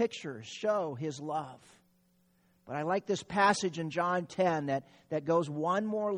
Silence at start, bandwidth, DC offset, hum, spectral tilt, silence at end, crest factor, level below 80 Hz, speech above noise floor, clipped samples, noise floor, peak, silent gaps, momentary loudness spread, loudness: 0 s; 11 kHz; under 0.1%; none; -5 dB/octave; 0 s; 20 dB; -74 dBFS; 38 dB; under 0.1%; -70 dBFS; -12 dBFS; none; 11 LU; -32 LUFS